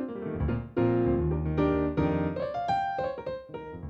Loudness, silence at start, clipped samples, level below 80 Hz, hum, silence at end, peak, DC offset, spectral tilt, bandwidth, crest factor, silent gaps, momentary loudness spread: -29 LUFS; 0 s; under 0.1%; -42 dBFS; none; 0 s; -14 dBFS; under 0.1%; -9.5 dB/octave; 7.8 kHz; 16 dB; none; 10 LU